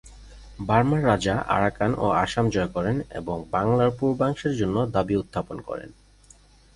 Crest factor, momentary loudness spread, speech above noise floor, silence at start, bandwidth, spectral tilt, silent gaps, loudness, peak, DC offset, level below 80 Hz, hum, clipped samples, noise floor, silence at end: 18 dB; 11 LU; 30 dB; 0.05 s; 11.5 kHz; -7 dB/octave; none; -24 LUFS; -6 dBFS; under 0.1%; -46 dBFS; 50 Hz at -45 dBFS; under 0.1%; -54 dBFS; 0.85 s